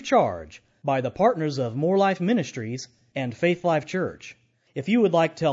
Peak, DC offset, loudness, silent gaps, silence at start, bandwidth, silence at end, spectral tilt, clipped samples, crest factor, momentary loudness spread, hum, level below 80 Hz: -8 dBFS; under 0.1%; -24 LUFS; none; 0 s; 7.8 kHz; 0 s; -6.5 dB/octave; under 0.1%; 16 dB; 15 LU; none; -62 dBFS